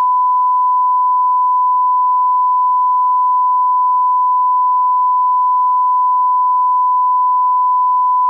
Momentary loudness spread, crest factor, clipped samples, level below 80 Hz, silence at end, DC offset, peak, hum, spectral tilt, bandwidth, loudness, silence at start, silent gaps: 0 LU; 4 dB; under 0.1%; under -90 dBFS; 0 s; under 0.1%; -10 dBFS; none; 0 dB/octave; 1.2 kHz; -13 LUFS; 0 s; none